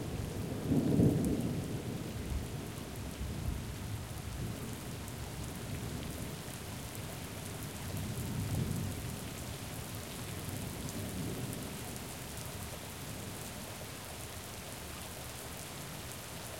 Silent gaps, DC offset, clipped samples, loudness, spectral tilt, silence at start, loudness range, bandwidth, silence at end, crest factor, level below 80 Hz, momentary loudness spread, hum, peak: none; under 0.1%; under 0.1%; -39 LUFS; -5 dB/octave; 0 s; 8 LU; 17 kHz; 0 s; 22 dB; -50 dBFS; 9 LU; none; -16 dBFS